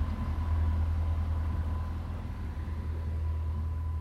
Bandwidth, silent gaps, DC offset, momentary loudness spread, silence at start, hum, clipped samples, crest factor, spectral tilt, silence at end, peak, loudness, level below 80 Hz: 5 kHz; none; under 0.1%; 7 LU; 0 s; none; under 0.1%; 12 dB; -8.5 dB/octave; 0 s; -20 dBFS; -34 LUFS; -36 dBFS